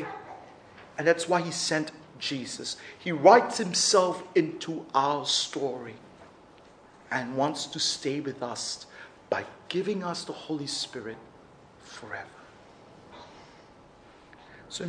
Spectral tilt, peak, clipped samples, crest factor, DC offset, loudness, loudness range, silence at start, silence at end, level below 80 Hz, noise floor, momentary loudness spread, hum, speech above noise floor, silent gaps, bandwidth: -3 dB/octave; -4 dBFS; under 0.1%; 26 dB; under 0.1%; -27 LUFS; 15 LU; 0 s; 0 s; -70 dBFS; -54 dBFS; 23 LU; none; 26 dB; none; 10.5 kHz